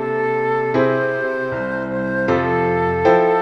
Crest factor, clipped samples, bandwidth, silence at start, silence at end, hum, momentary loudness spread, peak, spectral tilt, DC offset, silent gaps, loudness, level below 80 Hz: 16 dB; under 0.1%; 6.8 kHz; 0 s; 0 s; none; 8 LU; -2 dBFS; -8 dB/octave; under 0.1%; none; -18 LUFS; -48 dBFS